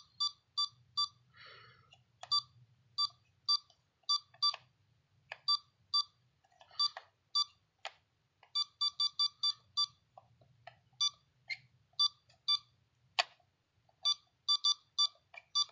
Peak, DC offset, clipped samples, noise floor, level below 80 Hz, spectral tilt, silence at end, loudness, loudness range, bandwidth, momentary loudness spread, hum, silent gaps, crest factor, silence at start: -12 dBFS; under 0.1%; under 0.1%; -75 dBFS; -84 dBFS; 2.5 dB/octave; 0.05 s; -34 LUFS; 3 LU; 7.6 kHz; 13 LU; none; none; 26 dB; 0.2 s